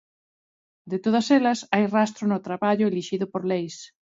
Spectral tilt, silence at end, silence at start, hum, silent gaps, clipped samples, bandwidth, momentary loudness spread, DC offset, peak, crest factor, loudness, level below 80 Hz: -5.5 dB/octave; 0.3 s; 0.85 s; none; none; under 0.1%; 7.8 kHz; 9 LU; under 0.1%; -4 dBFS; 20 dB; -24 LUFS; -72 dBFS